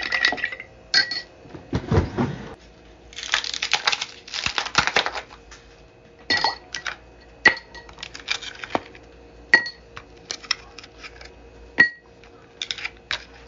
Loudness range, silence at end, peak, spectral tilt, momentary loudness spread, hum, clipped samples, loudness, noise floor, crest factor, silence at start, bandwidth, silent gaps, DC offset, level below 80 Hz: 2 LU; 0 s; 0 dBFS; -2.5 dB/octave; 23 LU; none; under 0.1%; -23 LUFS; -49 dBFS; 26 dB; 0 s; 7.6 kHz; none; under 0.1%; -46 dBFS